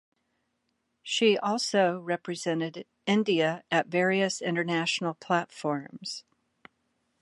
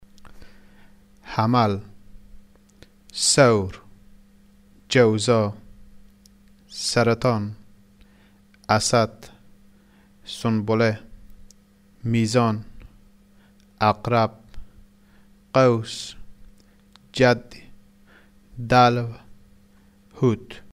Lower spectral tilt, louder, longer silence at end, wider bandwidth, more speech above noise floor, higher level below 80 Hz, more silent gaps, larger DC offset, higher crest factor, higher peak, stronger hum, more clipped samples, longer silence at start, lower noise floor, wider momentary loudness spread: about the same, -4.5 dB/octave vs -5 dB/octave; second, -28 LUFS vs -21 LUFS; first, 1 s vs 0.15 s; second, 11.5 kHz vs 14 kHz; first, 50 dB vs 34 dB; second, -80 dBFS vs -50 dBFS; neither; neither; about the same, 20 dB vs 20 dB; second, -10 dBFS vs -4 dBFS; neither; neither; first, 1.05 s vs 0.25 s; first, -77 dBFS vs -55 dBFS; second, 12 LU vs 17 LU